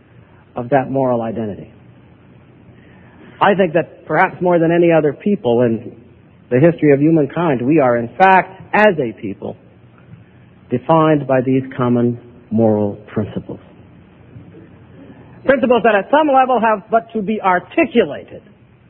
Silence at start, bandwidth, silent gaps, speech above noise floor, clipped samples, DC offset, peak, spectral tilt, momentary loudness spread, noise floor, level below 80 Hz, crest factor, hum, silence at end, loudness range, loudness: 0.55 s; 4.8 kHz; none; 31 dB; under 0.1%; under 0.1%; 0 dBFS; -10 dB/octave; 14 LU; -45 dBFS; -52 dBFS; 16 dB; none; 0.5 s; 7 LU; -15 LUFS